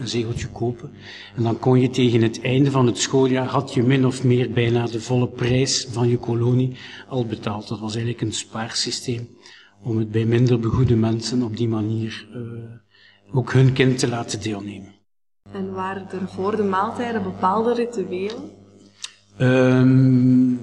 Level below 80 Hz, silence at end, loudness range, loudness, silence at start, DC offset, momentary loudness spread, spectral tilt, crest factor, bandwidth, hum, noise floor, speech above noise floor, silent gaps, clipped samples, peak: -52 dBFS; 0 s; 6 LU; -21 LUFS; 0 s; under 0.1%; 17 LU; -6 dB/octave; 18 dB; 10.5 kHz; 50 Hz at -45 dBFS; -69 dBFS; 48 dB; none; under 0.1%; -2 dBFS